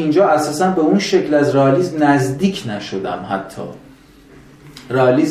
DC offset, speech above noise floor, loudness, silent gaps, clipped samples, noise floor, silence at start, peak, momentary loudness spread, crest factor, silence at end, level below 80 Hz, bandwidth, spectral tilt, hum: under 0.1%; 28 dB; -16 LUFS; none; under 0.1%; -44 dBFS; 0 s; 0 dBFS; 11 LU; 16 dB; 0 s; -52 dBFS; 14.5 kHz; -6 dB/octave; none